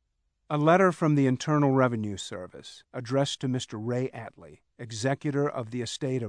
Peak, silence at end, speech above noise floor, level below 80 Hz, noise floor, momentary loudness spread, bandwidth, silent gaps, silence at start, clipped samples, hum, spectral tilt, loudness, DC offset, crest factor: -8 dBFS; 0 s; 47 dB; -70 dBFS; -75 dBFS; 18 LU; 10 kHz; none; 0.5 s; under 0.1%; none; -6 dB/octave; -27 LUFS; under 0.1%; 18 dB